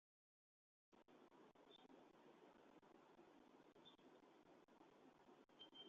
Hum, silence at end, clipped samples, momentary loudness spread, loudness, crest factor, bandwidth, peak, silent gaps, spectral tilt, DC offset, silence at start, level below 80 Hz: none; 0 s; under 0.1%; 4 LU; -68 LUFS; 18 dB; 7.2 kHz; -52 dBFS; none; -2 dB/octave; under 0.1%; 0.9 s; under -90 dBFS